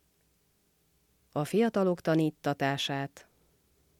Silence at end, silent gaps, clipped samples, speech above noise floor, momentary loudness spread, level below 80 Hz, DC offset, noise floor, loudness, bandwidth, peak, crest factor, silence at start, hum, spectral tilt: 0.8 s; none; under 0.1%; 42 dB; 9 LU; -72 dBFS; under 0.1%; -71 dBFS; -30 LUFS; 16.5 kHz; -14 dBFS; 18 dB; 1.35 s; none; -6 dB/octave